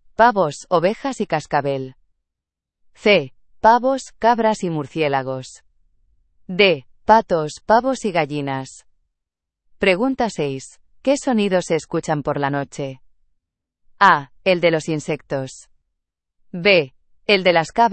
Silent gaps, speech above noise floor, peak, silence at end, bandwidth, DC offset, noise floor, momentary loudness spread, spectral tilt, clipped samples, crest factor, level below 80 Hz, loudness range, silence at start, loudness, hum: none; 66 dB; 0 dBFS; 0 s; 8.8 kHz; under 0.1%; -84 dBFS; 14 LU; -5 dB/octave; under 0.1%; 20 dB; -54 dBFS; 3 LU; 0.2 s; -19 LUFS; none